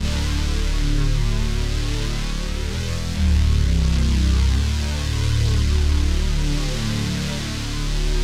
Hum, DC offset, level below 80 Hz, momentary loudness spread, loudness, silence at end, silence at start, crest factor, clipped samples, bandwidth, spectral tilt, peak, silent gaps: none; under 0.1%; -20 dBFS; 7 LU; -22 LUFS; 0 s; 0 s; 12 dB; under 0.1%; 14 kHz; -5 dB/octave; -8 dBFS; none